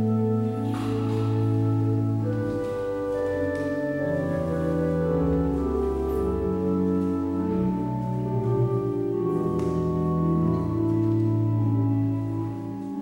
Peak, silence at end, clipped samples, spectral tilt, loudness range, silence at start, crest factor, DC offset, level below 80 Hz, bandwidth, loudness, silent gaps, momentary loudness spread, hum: -12 dBFS; 0 s; under 0.1%; -9.5 dB/octave; 2 LU; 0 s; 12 dB; under 0.1%; -42 dBFS; 15 kHz; -25 LUFS; none; 4 LU; none